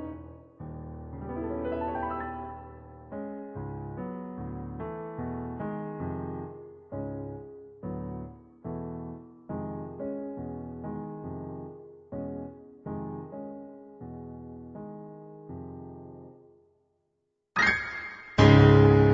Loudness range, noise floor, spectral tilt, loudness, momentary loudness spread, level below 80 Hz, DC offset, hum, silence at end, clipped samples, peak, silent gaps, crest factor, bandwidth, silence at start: 10 LU; -78 dBFS; -6 dB/octave; -29 LUFS; 21 LU; -48 dBFS; under 0.1%; none; 0 s; under 0.1%; -4 dBFS; none; 26 dB; 7.2 kHz; 0 s